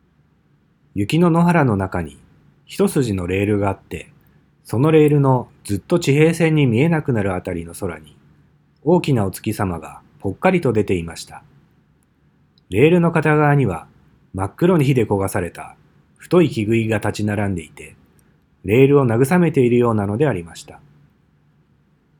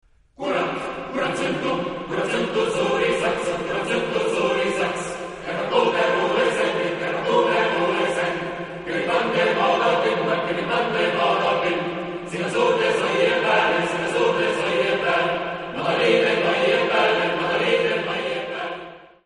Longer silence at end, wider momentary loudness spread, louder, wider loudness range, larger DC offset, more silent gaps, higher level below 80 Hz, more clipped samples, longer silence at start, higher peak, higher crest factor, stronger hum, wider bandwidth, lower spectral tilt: first, 1.45 s vs 0.2 s; first, 17 LU vs 9 LU; first, -18 LUFS vs -21 LUFS; about the same, 5 LU vs 3 LU; neither; neither; about the same, -52 dBFS vs -56 dBFS; neither; first, 0.95 s vs 0.4 s; first, 0 dBFS vs -6 dBFS; about the same, 18 dB vs 16 dB; neither; first, 20 kHz vs 10.5 kHz; first, -7 dB/octave vs -4.5 dB/octave